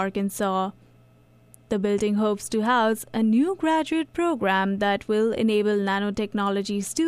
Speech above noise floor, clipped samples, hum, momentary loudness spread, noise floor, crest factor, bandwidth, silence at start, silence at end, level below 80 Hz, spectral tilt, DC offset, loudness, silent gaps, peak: 32 dB; under 0.1%; none; 5 LU; -55 dBFS; 14 dB; 15.5 kHz; 0 s; 0 s; -56 dBFS; -5 dB/octave; under 0.1%; -24 LUFS; none; -10 dBFS